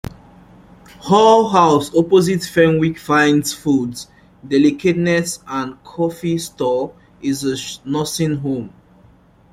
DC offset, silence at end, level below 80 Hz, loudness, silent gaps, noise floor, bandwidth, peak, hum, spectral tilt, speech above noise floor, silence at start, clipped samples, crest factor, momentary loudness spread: under 0.1%; 0.85 s; -50 dBFS; -17 LUFS; none; -49 dBFS; 16 kHz; -2 dBFS; none; -5.5 dB/octave; 33 dB; 1 s; under 0.1%; 16 dB; 14 LU